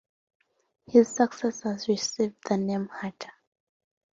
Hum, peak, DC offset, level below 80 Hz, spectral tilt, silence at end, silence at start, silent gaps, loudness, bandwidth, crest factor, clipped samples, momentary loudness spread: none; -8 dBFS; under 0.1%; -70 dBFS; -5 dB/octave; 0.85 s; 0.9 s; none; -27 LUFS; 7.8 kHz; 22 dB; under 0.1%; 15 LU